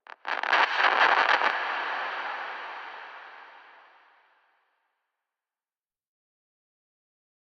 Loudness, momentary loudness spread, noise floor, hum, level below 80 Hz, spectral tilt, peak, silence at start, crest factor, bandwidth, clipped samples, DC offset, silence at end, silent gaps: -25 LUFS; 21 LU; under -90 dBFS; none; -88 dBFS; -0.5 dB/octave; -8 dBFS; 0.25 s; 22 dB; 8.4 kHz; under 0.1%; under 0.1%; 3.85 s; none